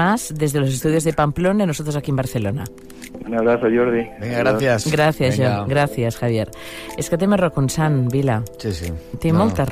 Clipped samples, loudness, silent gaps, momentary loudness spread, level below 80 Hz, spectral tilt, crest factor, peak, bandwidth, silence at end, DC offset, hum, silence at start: under 0.1%; -19 LUFS; none; 11 LU; -42 dBFS; -6 dB/octave; 14 dB; -6 dBFS; 15.5 kHz; 0 s; under 0.1%; none; 0 s